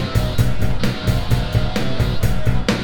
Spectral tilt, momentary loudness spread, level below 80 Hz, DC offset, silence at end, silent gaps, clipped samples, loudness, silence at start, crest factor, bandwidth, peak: -6 dB/octave; 2 LU; -24 dBFS; under 0.1%; 0 s; none; under 0.1%; -20 LUFS; 0 s; 14 dB; 19 kHz; -2 dBFS